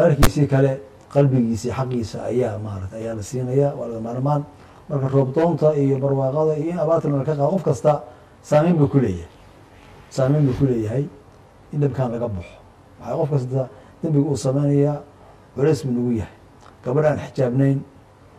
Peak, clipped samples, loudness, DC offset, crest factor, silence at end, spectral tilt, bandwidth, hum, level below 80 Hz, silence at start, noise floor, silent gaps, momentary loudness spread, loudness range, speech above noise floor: -4 dBFS; under 0.1%; -21 LUFS; under 0.1%; 18 dB; 0.55 s; -8 dB/octave; 13.5 kHz; none; -40 dBFS; 0 s; -47 dBFS; none; 12 LU; 4 LU; 28 dB